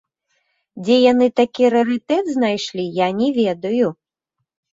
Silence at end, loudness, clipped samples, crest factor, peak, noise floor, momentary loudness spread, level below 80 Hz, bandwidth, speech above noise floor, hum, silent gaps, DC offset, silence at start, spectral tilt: 0.85 s; -18 LUFS; under 0.1%; 16 dB; -2 dBFS; -78 dBFS; 8 LU; -64 dBFS; 7.8 kHz; 61 dB; none; none; under 0.1%; 0.75 s; -5.5 dB/octave